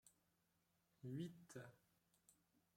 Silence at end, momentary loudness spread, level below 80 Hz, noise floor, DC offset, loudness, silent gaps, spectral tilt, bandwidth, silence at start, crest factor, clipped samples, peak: 0.45 s; 9 LU; under -90 dBFS; -85 dBFS; under 0.1%; -56 LUFS; none; -6.5 dB/octave; 16 kHz; 0.05 s; 20 dB; under 0.1%; -40 dBFS